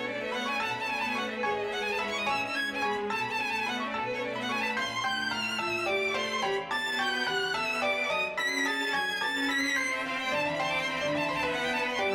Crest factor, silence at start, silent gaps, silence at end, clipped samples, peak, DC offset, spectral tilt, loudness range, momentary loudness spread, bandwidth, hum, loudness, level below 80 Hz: 12 dB; 0 s; none; 0 s; under 0.1%; -18 dBFS; under 0.1%; -2.5 dB/octave; 2 LU; 3 LU; 20 kHz; none; -29 LUFS; -64 dBFS